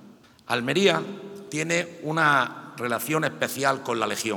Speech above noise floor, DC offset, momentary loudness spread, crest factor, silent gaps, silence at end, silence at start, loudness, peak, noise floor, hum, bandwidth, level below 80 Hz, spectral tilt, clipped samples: 23 dB; under 0.1%; 10 LU; 22 dB; none; 0 s; 0.05 s; -25 LUFS; -4 dBFS; -47 dBFS; none; 19.5 kHz; -74 dBFS; -4 dB/octave; under 0.1%